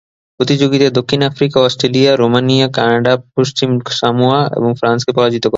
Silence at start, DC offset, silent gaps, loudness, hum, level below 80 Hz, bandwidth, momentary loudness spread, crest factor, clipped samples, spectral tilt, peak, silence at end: 0.4 s; under 0.1%; none; -13 LUFS; none; -52 dBFS; 7.8 kHz; 4 LU; 12 dB; under 0.1%; -5.5 dB/octave; 0 dBFS; 0 s